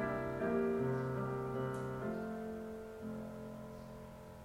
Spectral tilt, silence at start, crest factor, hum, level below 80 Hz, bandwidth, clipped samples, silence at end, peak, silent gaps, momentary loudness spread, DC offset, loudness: -8 dB/octave; 0 s; 16 dB; none; -60 dBFS; 16.5 kHz; under 0.1%; 0 s; -24 dBFS; none; 14 LU; under 0.1%; -40 LUFS